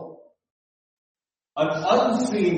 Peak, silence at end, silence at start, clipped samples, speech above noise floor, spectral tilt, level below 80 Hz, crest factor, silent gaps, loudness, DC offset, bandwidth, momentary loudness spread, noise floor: -6 dBFS; 0 s; 0 s; under 0.1%; 23 dB; -5.5 dB/octave; -66 dBFS; 20 dB; 0.50-1.15 s; -22 LUFS; under 0.1%; 8.4 kHz; 17 LU; -44 dBFS